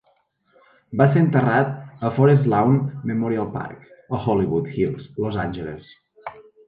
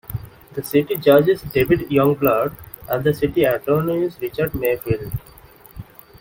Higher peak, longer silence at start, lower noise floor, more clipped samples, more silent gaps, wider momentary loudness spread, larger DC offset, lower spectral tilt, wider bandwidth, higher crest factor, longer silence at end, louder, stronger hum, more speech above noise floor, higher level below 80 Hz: about the same, -4 dBFS vs -2 dBFS; first, 0.9 s vs 0.1 s; first, -64 dBFS vs -45 dBFS; neither; neither; about the same, 19 LU vs 17 LU; neither; first, -11 dB/octave vs -7 dB/octave; second, 4.6 kHz vs 17 kHz; about the same, 18 dB vs 18 dB; second, 0.25 s vs 0.4 s; about the same, -21 LUFS vs -19 LUFS; neither; first, 44 dB vs 27 dB; second, -52 dBFS vs -44 dBFS